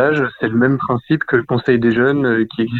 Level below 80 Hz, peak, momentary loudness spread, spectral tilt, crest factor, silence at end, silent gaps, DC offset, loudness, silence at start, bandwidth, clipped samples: -52 dBFS; -2 dBFS; 4 LU; -9 dB/octave; 14 dB; 0 s; none; under 0.1%; -16 LUFS; 0 s; 4.5 kHz; under 0.1%